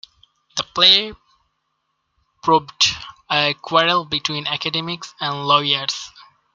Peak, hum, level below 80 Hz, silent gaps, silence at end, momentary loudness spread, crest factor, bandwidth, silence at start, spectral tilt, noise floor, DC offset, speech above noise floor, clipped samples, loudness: 0 dBFS; none; -58 dBFS; none; 0.3 s; 16 LU; 20 dB; 13 kHz; 0.55 s; -2.5 dB/octave; -72 dBFS; under 0.1%; 53 dB; under 0.1%; -18 LUFS